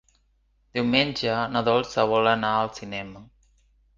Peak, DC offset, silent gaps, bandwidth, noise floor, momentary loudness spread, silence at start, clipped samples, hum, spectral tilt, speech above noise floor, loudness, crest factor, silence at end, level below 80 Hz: -4 dBFS; under 0.1%; none; 7.6 kHz; -66 dBFS; 13 LU; 0.75 s; under 0.1%; none; -5 dB/octave; 42 dB; -24 LUFS; 20 dB; 0.75 s; -56 dBFS